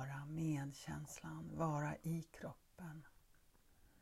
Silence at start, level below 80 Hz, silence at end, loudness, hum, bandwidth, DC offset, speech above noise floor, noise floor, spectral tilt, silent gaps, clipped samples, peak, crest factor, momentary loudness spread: 0 s; -70 dBFS; 0.15 s; -46 LUFS; none; 15 kHz; under 0.1%; 24 dB; -70 dBFS; -6.5 dB/octave; none; under 0.1%; -30 dBFS; 16 dB; 13 LU